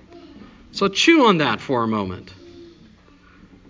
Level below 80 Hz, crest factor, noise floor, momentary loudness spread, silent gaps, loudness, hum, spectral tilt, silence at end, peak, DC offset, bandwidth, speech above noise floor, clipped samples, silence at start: -52 dBFS; 20 dB; -50 dBFS; 18 LU; none; -18 LUFS; none; -4.5 dB/octave; 1.05 s; -2 dBFS; under 0.1%; 7.6 kHz; 32 dB; under 0.1%; 0.15 s